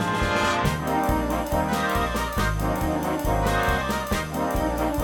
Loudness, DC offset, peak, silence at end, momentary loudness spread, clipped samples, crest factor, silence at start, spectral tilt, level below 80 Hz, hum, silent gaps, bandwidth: -24 LUFS; under 0.1%; -10 dBFS; 0 s; 3 LU; under 0.1%; 14 dB; 0 s; -5 dB/octave; -32 dBFS; none; none; 19 kHz